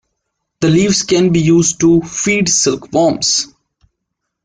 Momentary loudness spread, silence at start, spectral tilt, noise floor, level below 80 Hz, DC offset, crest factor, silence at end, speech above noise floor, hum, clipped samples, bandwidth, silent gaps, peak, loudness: 4 LU; 0.6 s; -4 dB/octave; -75 dBFS; -46 dBFS; under 0.1%; 12 dB; 1 s; 62 dB; none; under 0.1%; 10 kHz; none; -2 dBFS; -12 LUFS